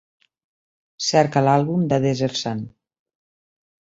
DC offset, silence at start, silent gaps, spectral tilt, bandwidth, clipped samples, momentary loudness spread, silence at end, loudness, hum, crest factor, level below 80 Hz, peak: under 0.1%; 1 s; none; -5.5 dB/octave; 7.8 kHz; under 0.1%; 11 LU; 1.3 s; -20 LUFS; none; 20 dB; -60 dBFS; -2 dBFS